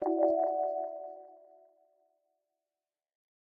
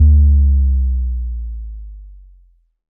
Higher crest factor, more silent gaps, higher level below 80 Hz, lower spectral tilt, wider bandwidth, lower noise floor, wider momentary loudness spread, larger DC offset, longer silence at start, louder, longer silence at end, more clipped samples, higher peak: first, 20 dB vs 12 dB; neither; second, -84 dBFS vs -16 dBFS; second, -7 dB/octave vs -19 dB/octave; first, 2.2 kHz vs 0.5 kHz; first, under -90 dBFS vs -51 dBFS; second, 18 LU vs 22 LU; neither; about the same, 0 s vs 0 s; second, -31 LUFS vs -16 LUFS; first, 2.25 s vs 0.85 s; neither; second, -16 dBFS vs -2 dBFS